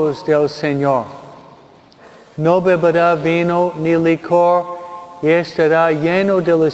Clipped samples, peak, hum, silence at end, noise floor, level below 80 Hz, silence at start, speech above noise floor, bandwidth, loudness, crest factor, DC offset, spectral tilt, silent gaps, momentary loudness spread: under 0.1%; 0 dBFS; none; 0 s; -45 dBFS; -56 dBFS; 0 s; 30 dB; 8 kHz; -15 LUFS; 14 dB; under 0.1%; -7.5 dB/octave; none; 8 LU